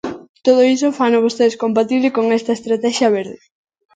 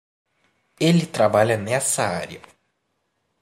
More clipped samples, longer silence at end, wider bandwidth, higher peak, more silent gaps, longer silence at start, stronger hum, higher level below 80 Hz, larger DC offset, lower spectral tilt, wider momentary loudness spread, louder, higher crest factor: neither; second, 0.6 s vs 1.05 s; second, 9.2 kHz vs 15.5 kHz; first, 0 dBFS vs -4 dBFS; first, 0.29-0.34 s vs none; second, 0.05 s vs 0.8 s; neither; about the same, -64 dBFS vs -62 dBFS; neither; about the same, -4.5 dB/octave vs -4.5 dB/octave; second, 7 LU vs 13 LU; first, -16 LUFS vs -20 LUFS; about the same, 16 dB vs 20 dB